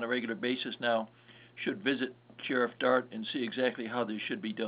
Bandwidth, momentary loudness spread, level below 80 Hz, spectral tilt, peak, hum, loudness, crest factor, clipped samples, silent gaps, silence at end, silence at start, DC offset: 5 kHz; 9 LU; -80 dBFS; -2 dB/octave; -14 dBFS; none; -33 LUFS; 20 dB; under 0.1%; none; 0 s; 0 s; under 0.1%